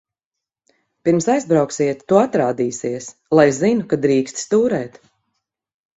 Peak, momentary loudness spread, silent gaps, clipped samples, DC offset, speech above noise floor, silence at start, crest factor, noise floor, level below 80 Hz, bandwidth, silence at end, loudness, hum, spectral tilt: 0 dBFS; 10 LU; none; under 0.1%; under 0.1%; 68 dB; 1.05 s; 18 dB; -85 dBFS; -58 dBFS; 8.4 kHz; 1.1 s; -18 LUFS; none; -5.5 dB/octave